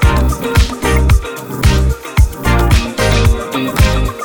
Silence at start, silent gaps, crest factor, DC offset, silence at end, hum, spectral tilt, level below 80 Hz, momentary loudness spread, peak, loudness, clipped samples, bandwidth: 0 s; none; 12 dB; 0.5%; 0 s; none; -5.5 dB/octave; -14 dBFS; 4 LU; 0 dBFS; -14 LUFS; under 0.1%; 20 kHz